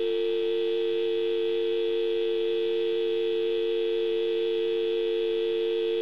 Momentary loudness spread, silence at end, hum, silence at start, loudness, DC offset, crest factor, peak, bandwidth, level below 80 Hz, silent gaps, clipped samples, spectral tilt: 0 LU; 0 s; none; 0 s; -27 LUFS; 0.4%; 8 dB; -18 dBFS; 5.6 kHz; -72 dBFS; none; under 0.1%; -5.5 dB/octave